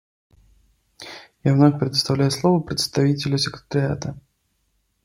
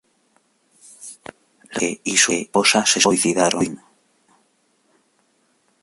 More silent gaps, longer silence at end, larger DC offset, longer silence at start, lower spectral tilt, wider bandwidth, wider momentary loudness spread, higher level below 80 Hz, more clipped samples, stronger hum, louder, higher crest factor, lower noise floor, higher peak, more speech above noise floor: neither; second, 0.85 s vs 2.05 s; neither; about the same, 1 s vs 1 s; first, -6 dB/octave vs -2 dB/octave; first, 15.5 kHz vs 12 kHz; second, 20 LU vs 23 LU; first, -54 dBFS vs -62 dBFS; neither; neither; second, -20 LUFS vs -17 LUFS; about the same, 18 dB vs 20 dB; first, -69 dBFS vs -64 dBFS; about the same, -4 dBFS vs -2 dBFS; first, 49 dB vs 45 dB